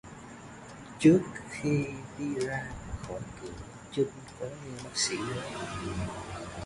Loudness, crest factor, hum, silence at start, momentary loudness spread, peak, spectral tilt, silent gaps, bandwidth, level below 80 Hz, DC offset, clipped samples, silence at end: -32 LUFS; 22 dB; none; 0.05 s; 21 LU; -10 dBFS; -5 dB/octave; none; 11.5 kHz; -52 dBFS; under 0.1%; under 0.1%; 0 s